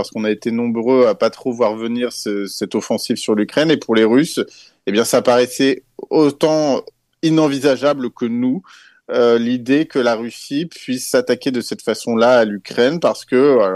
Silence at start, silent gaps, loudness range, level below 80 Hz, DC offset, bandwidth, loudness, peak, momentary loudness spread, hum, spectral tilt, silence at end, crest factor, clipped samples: 0 s; none; 2 LU; -64 dBFS; under 0.1%; 12.5 kHz; -17 LUFS; -2 dBFS; 9 LU; none; -5 dB/octave; 0 s; 14 dB; under 0.1%